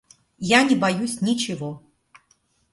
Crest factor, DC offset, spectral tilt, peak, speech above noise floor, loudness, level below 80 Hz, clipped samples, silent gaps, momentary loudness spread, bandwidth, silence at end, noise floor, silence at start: 20 dB; under 0.1%; -4 dB/octave; -4 dBFS; 44 dB; -21 LUFS; -62 dBFS; under 0.1%; none; 16 LU; 11.5 kHz; 0.95 s; -65 dBFS; 0.4 s